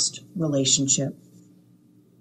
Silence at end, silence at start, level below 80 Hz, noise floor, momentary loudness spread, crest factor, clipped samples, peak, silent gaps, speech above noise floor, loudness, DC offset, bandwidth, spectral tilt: 1.05 s; 0 s; -66 dBFS; -56 dBFS; 10 LU; 20 dB; under 0.1%; -8 dBFS; none; 32 dB; -22 LUFS; under 0.1%; 13 kHz; -3 dB/octave